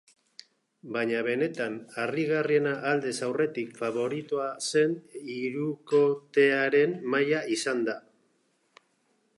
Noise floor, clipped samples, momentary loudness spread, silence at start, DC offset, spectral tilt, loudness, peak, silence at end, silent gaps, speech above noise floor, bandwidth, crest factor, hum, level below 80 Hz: -71 dBFS; under 0.1%; 9 LU; 0.85 s; under 0.1%; -4.5 dB/octave; -28 LUFS; -12 dBFS; 1.4 s; none; 44 dB; 11.5 kHz; 18 dB; none; -82 dBFS